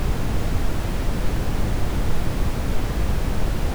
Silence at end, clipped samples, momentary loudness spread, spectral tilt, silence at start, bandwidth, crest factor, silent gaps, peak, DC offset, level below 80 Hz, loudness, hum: 0 s; under 0.1%; 1 LU; -6 dB/octave; 0 s; over 20 kHz; 10 dB; none; -10 dBFS; under 0.1%; -24 dBFS; -26 LUFS; none